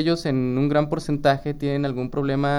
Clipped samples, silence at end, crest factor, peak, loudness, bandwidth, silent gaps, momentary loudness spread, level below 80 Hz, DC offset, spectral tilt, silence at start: under 0.1%; 0 s; 16 dB; -6 dBFS; -23 LUFS; 12 kHz; none; 4 LU; -44 dBFS; under 0.1%; -7 dB/octave; 0 s